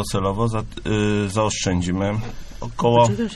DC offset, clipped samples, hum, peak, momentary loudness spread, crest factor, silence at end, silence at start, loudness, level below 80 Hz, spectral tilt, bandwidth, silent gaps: under 0.1%; under 0.1%; none; -4 dBFS; 12 LU; 18 dB; 0 s; 0 s; -21 LUFS; -38 dBFS; -5.5 dB/octave; 13 kHz; none